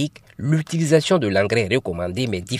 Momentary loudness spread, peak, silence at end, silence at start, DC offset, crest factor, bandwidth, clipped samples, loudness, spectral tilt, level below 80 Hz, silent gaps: 9 LU; -4 dBFS; 0 s; 0 s; under 0.1%; 18 dB; 13.5 kHz; under 0.1%; -20 LUFS; -5.5 dB/octave; -52 dBFS; none